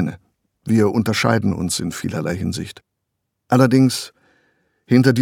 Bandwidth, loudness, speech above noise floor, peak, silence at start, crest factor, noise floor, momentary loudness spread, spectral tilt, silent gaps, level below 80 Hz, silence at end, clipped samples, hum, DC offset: 17 kHz; -18 LUFS; 59 dB; 0 dBFS; 0 s; 18 dB; -76 dBFS; 13 LU; -6 dB/octave; none; -52 dBFS; 0 s; under 0.1%; none; under 0.1%